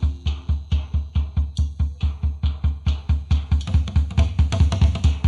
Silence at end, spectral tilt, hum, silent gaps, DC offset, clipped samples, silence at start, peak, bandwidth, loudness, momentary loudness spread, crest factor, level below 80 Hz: 0 s; -7 dB/octave; none; none; under 0.1%; under 0.1%; 0 s; -6 dBFS; 7.8 kHz; -23 LUFS; 6 LU; 14 dB; -22 dBFS